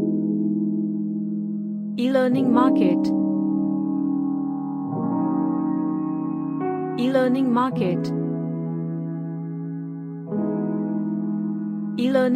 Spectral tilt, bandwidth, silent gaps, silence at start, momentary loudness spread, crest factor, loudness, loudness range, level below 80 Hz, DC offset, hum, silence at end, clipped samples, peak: -8.5 dB/octave; 10 kHz; none; 0 s; 9 LU; 16 dB; -24 LUFS; 6 LU; -70 dBFS; under 0.1%; none; 0 s; under 0.1%; -6 dBFS